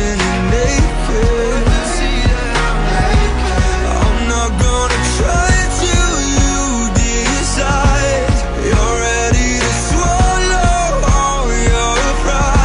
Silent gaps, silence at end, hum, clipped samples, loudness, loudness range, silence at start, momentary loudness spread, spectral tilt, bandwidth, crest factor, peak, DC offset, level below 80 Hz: none; 0 s; none; under 0.1%; -14 LUFS; 1 LU; 0 s; 3 LU; -4 dB/octave; 10.5 kHz; 10 dB; -2 dBFS; under 0.1%; -16 dBFS